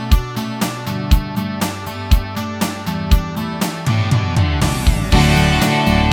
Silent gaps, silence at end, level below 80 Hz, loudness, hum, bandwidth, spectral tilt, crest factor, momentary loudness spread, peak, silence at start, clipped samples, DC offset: none; 0 s; -20 dBFS; -17 LUFS; none; 18.5 kHz; -5.5 dB/octave; 16 dB; 10 LU; 0 dBFS; 0 s; under 0.1%; under 0.1%